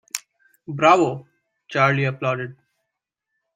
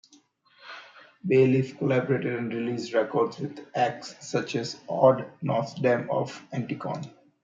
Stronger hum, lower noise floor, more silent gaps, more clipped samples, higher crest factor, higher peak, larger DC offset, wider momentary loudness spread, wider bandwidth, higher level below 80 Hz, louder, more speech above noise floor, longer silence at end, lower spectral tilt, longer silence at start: neither; first, -81 dBFS vs -60 dBFS; neither; neither; about the same, 22 dB vs 22 dB; first, -2 dBFS vs -6 dBFS; neither; first, 19 LU vs 16 LU; first, 16 kHz vs 7.8 kHz; first, -66 dBFS vs -72 dBFS; first, -20 LUFS vs -27 LUFS; first, 62 dB vs 34 dB; first, 1.05 s vs 0.35 s; second, -5 dB/octave vs -6.5 dB/octave; second, 0.15 s vs 0.65 s